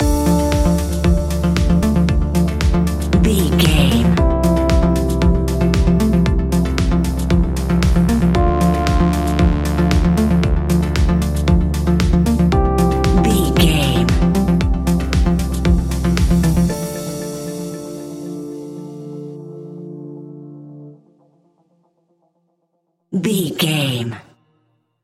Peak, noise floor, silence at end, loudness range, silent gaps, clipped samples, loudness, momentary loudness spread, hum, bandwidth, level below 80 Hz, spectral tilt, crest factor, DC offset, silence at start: 0 dBFS; -68 dBFS; 0.8 s; 15 LU; none; under 0.1%; -16 LUFS; 15 LU; none; 15.5 kHz; -20 dBFS; -6.5 dB/octave; 16 dB; under 0.1%; 0 s